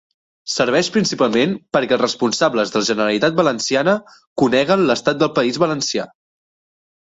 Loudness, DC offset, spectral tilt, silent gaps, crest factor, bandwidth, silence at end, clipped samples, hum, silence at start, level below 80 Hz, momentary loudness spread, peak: -17 LUFS; under 0.1%; -4 dB/octave; 4.27-4.36 s; 16 dB; 8.2 kHz; 1 s; under 0.1%; none; 0.45 s; -58 dBFS; 6 LU; -2 dBFS